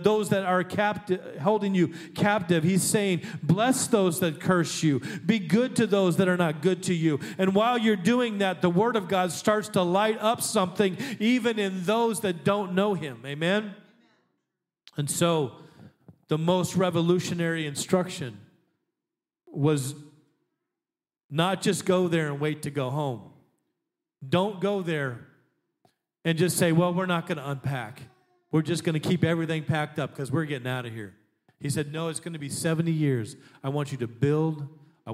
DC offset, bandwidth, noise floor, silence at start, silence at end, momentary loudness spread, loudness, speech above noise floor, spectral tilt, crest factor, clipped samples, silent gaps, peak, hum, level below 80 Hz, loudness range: under 0.1%; 16 kHz; under -90 dBFS; 0 s; 0 s; 10 LU; -26 LUFS; over 64 dB; -5.5 dB/octave; 20 dB; under 0.1%; 21.24-21.29 s; -8 dBFS; none; -70 dBFS; 6 LU